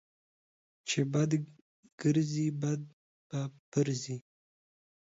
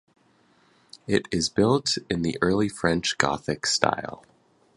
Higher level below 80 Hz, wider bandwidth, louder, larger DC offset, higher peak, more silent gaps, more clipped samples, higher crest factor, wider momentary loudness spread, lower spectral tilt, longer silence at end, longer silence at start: second, -74 dBFS vs -52 dBFS; second, 8 kHz vs 11.5 kHz; second, -33 LUFS vs -24 LUFS; neither; second, -18 dBFS vs 0 dBFS; first, 1.62-1.83 s, 1.92-1.98 s, 2.93-3.30 s, 3.59-3.72 s vs none; neither; second, 18 dB vs 26 dB; first, 13 LU vs 6 LU; first, -6 dB/octave vs -4 dB/octave; first, 0.95 s vs 0.6 s; second, 0.85 s vs 1.1 s